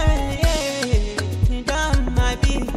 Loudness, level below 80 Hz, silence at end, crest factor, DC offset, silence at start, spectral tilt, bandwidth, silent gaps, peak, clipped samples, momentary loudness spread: -21 LUFS; -22 dBFS; 0 s; 12 dB; under 0.1%; 0 s; -5 dB/octave; 14 kHz; none; -6 dBFS; under 0.1%; 2 LU